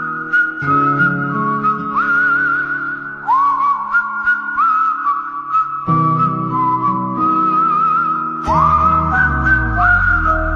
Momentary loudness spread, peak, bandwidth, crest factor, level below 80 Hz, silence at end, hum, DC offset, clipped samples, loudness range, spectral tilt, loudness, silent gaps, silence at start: 5 LU; -2 dBFS; 6.8 kHz; 14 dB; -30 dBFS; 0 s; none; under 0.1%; under 0.1%; 2 LU; -8 dB/octave; -15 LUFS; none; 0 s